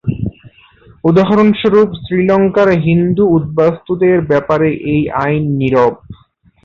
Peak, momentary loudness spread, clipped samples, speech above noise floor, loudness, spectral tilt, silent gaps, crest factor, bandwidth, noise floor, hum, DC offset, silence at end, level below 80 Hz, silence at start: 0 dBFS; 5 LU; under 0.1%; 37 dB; -12 LUFS; -9 dB/octave; none; 12 dB; 7 kHz; -49 dBFS; none; under 0.1%; 0.5 s; -40 dBFS; 0.05 s